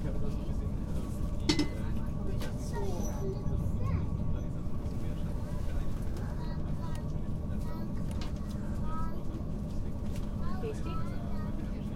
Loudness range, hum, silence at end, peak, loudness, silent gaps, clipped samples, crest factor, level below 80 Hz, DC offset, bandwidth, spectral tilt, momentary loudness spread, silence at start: 3 LU; none; 0 s; -12 dBFS; -36 LUFS; none; under 0.1%; 20 dB; -38 dBFS; under 0.1%; 13.5 kHz; -6.5 dB/octave; 5 LU; 0 s